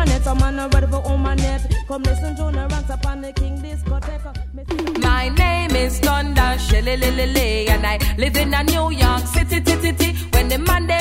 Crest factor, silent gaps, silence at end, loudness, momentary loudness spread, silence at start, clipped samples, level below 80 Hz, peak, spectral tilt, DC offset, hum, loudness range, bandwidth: 16 dB; none; 0 s; -19 LUFS; 7 LU; 0 s; under 0.1%; -20 dBFS; -2 dBFS; -5 dB/octave; under 0.1%; none; 5 LU; 16.5 kHz